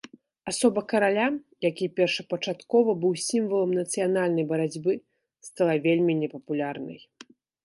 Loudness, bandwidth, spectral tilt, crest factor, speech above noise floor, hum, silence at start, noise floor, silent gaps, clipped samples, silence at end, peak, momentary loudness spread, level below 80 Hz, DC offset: -26 LUFS; 11.5 kHz; -5 dB/octave; 18 dB; 28 dB; none; 0.45 s; -53 dBFS; none; under 0.1%; 0.65 s; -8 dBFS; 10 LU; -74 dBFS; under 0.1%